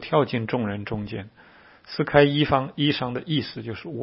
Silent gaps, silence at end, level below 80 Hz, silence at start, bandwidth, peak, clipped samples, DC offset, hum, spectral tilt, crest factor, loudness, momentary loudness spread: none; 0 s; -52 dBFS; 0 s; 5.8 kHz; -2 dBFS; under 0.1%; under 0.1%; none; -10.5 dB/octave; 24 dB; -24 LUFS; 15 LU